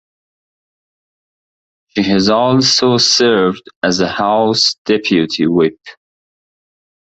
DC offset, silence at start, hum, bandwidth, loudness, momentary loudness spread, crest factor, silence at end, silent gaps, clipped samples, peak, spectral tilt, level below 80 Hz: under 0.1%; 1.95 s; none; 8.2 kHz; -13 LUFS; 7 LU; 14 dB; 1.1 s; 3.76-3.81 s, 4.78-4.85 s; under 0.1%; 0 dBFS; -4 dB/octave; -50 dBFS